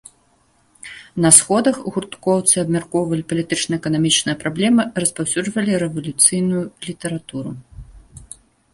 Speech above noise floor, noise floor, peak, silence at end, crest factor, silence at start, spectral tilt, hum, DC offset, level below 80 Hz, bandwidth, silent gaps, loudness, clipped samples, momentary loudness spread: 40 dB; -59 dBFS; 0 dBFS; 0.5 s; 20 dB; 0.85 s; -3.5 dB/octave; none; under 0.1%; -50 dBFS; 16 kHz; none; -17 LUFS; under 0.1%; 17 LU